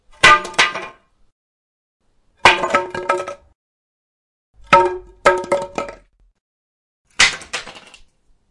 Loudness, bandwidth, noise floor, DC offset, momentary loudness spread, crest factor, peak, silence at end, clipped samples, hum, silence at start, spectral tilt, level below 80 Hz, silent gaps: -15 LUFS; 12 kHz; -52 dBFS; under 0.1%; 19 LU; 20 dB; 0 dBFS; 0.7 s; under 0.1%; none; 0.25 s; -2 dB/octave; -46 dBFS; 1.32-2.00 s, 3.55-4.54 s, 6.41-7.05 s